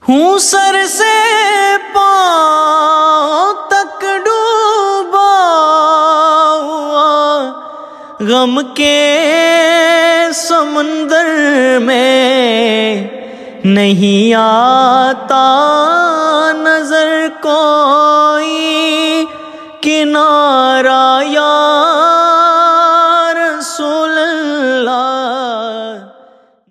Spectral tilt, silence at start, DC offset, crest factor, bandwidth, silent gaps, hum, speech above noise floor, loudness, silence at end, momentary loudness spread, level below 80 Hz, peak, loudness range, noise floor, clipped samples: -3 dB/octave; 0.05 s; under 0.1%; 10 dB; 14.5 kHz; none; none; 35 dB; -10 LUFS; 0.65 s; 8 LU; -60 dBFS; 0 dBFS; 2 LU; -44 dBFS; under 0.1%